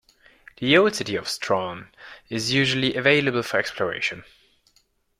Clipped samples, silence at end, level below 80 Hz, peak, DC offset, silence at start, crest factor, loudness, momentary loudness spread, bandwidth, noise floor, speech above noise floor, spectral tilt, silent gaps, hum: under 0.1%; 1 s; -60 dBFS; -4 dBFS; under 0.1%; 0.6 s; 22 dB; -22 LUFS; 15 LU; 15.5 kHz; -65 dBFS; 42 dB; -4 dB/octave; none; none